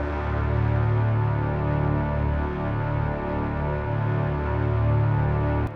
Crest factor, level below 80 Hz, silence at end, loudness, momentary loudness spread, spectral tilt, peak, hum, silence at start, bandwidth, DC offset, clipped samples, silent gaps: 12 dB; -32 dBFS; 0 s; -25 LUFS; 4 LU; -10.5 dB/octave; -12 dBFS; none; 0 s; 4.6 kHz; under 0.1%; under 0.1%; none